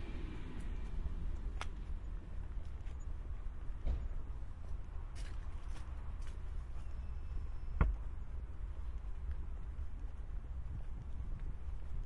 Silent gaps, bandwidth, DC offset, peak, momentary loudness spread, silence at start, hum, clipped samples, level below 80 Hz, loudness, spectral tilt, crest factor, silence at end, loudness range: none; 11 kHz; under 0.1%; -18 dBFS; 5 LU; 0 s; none; under 0.1%; -42 dBFS; -47 LUFS; -7 dB/octave; 22 dB; 0 s; 3 LU